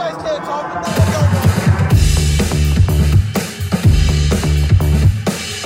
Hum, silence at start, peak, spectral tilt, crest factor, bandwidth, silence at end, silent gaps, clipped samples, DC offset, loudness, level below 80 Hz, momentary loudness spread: none; 0 s; 0 dBFS; -6 dB/octave; 12 dB; 16.5 kHz; 0 s; none; under 0.1%; under 0.1%; -15 LUFS; -18 dBFS; 8 LU